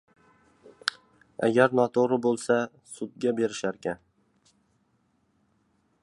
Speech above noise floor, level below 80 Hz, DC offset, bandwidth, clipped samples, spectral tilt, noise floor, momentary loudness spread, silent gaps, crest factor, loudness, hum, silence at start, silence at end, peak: 45 dB; -72 dBFS; under 0.1%; 11.5 kHz; under 0.1%; -5 dB/octave; -70 dBFS; 16 LU; none; 24 dB; -26 LUFS; none; 0.85 s; 2.05 s; -6 dBFS